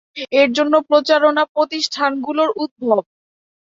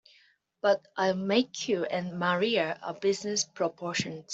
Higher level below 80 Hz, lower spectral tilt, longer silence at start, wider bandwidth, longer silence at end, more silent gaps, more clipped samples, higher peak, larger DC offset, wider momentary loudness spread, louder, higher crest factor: first, -68 dBFS vs -74 dBFS; about the same, -3 dB/octave vs -3.5 dB/octave; second, 0.15 s vs 0.65 s; about the same, 7.8 kHz vs 8.2 kHz; first, 0.6 s vs 0 s; first, 1.49-1.55 s, 2.71-2.76 s vs none; neither; first, -2 dBFS vs -12 dBFS; neither; about the same, 6 LU vs 6 LU; first, -17 LUFS vs -29 LUFS; about the same, 16 dB vs 18 dB